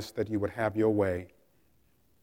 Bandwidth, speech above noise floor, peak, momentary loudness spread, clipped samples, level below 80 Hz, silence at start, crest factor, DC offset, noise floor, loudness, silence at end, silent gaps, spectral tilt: 16.5 kHz; 39 dB; -14 dBFS; 6 LU; under 0.1%; -64 dBFS; 0 s; 18 dB; under 0.1%; -69 dBFS; -30 LUFS; 0.95 s; none; -7 dB/octave